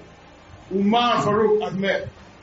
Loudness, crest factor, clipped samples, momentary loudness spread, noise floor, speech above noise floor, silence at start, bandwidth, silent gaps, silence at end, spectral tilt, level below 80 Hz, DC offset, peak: -21 LUFS; 16 dB; under 0.1%; 9 LU; -46 dBFS; 26 dB; 0 s; 7.6 kHz; none; 0.2 s; -4 dB/octave; -54 dBFS; under 0.1%; -6 dBFS